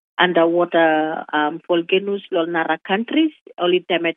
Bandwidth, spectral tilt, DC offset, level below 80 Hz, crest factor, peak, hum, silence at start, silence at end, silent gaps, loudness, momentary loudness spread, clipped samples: 3.9 kHz; -8.5 dB/octave; under 0.1%; -78 dBFS; 18 dB; 0 dBFS; none; 0.2 s; 0.05 s; 3.41-3.46 s; -19 LUFS; 6 LU; under 0.1%